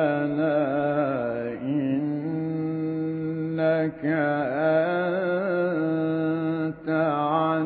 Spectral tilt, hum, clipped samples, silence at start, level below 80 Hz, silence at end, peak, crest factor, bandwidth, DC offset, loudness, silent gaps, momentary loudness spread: -12 dB/octave; none; under 0.1%; 0 s; -64 dBFS; 0 s; -10 dBFS; 14 dB; 4.5 kHz; under 0.1%; -25 LUFS; none; 5 LU